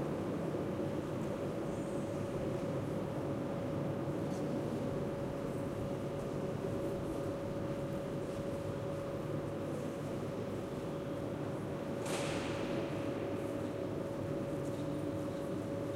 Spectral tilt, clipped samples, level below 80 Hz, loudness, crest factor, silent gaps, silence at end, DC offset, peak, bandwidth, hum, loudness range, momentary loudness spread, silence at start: -7 dB/octave; under 0.1%; -58 dBFS; -39 LUFS; 14 dB; none; 0 s; under 0.1%; -26 dBFS; 16 kHz; none; 2 LU; 2 LU; 0 s